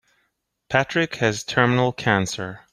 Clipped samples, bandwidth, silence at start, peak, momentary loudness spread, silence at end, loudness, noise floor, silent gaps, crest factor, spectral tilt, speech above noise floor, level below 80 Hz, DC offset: under 0.1%; 13.5 kHz; 0.7 s; -2 dBFS; 5 LU; 0.15 s; -21 LUFS; -73 dBFS; none; 20 dB; -5 dB/octave; 51 dB; -56 dBFS; under 0.1%